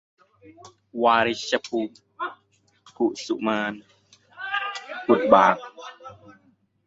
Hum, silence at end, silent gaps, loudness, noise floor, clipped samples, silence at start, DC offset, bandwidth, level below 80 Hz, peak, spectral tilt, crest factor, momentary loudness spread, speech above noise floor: none; 0.55 s; none; -23 LUFS; -64 dBFS; under 0.1%; 0.65 s; under 0.1%; 8 kHz; -66 dBFS; -2 dBFS; -4.5 dB/octave; 24 dB; 23 LU; 42 dB